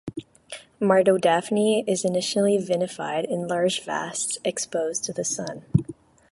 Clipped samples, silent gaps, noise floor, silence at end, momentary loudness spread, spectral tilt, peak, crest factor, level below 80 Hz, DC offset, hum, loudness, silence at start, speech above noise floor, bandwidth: under 0.1%; none; -44 dBFS; 0.4 s; 12 LU; -4.5 dB/octave; -4 dBFS; 20 dB; -54 dBFS; under 0.1%; none; -24 LUFS; 0.05 s; 21 dB; 11.5 kHz